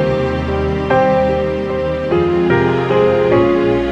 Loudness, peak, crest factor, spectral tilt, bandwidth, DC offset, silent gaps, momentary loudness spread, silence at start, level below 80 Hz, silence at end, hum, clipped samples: -15 LUFS; 0 dBFS; 14 dB; -8 dB/octave; 7.8 kHz; under 0.1%; none; 6 LU; 0 s; -32 dBFS; 0 s; none; under 0.1%